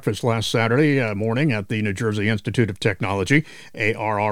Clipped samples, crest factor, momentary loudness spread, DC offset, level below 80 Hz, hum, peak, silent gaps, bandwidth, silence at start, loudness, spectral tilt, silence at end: under 0.1%; 18 dB; 5 LU; under 0.1%; -52 dBFS; none; -2 dBFS; none; 15.5 kHz; 0 s; -21 LUFS; -6 dB/octave; 0 s